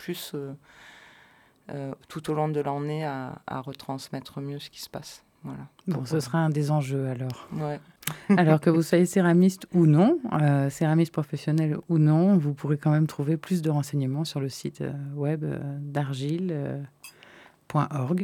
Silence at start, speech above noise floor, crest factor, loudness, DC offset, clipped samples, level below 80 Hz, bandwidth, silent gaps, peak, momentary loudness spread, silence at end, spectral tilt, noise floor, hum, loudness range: 0 s; 32 dB; 20 dB; -26 LUFS; under 0.1%; under 0.1%; -68 dBFS; 17 kHz; none; -6 dBFS; 16 LU; 0 s; -7.5 dB/octave; -58 dBFS; none; 11 LU